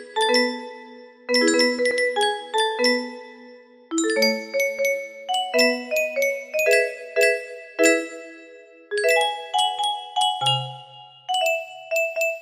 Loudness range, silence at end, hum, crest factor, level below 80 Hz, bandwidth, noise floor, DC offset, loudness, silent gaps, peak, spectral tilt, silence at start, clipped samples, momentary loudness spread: 2 LU; 0 s; none; 18 dB; -72 dBFS; 15.5 kHz; -47 dBFS; under 0.1%; -21 LUFS; none; -4 dBFS; -2 dB/octave; 0 s; under 0.1%; 15 LU